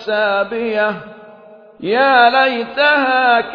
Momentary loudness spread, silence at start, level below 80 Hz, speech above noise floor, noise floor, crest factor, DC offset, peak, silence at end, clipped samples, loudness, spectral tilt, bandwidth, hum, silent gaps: 9 LU; 0 s; -60 dBFS; 27 dB; -41 dBFS; 16 dB; under 0.1%; 0 dBFS; 0 s; under 0.1%; -14 LUFS; -5.5 dB/octave; 5.4 kHz; none; none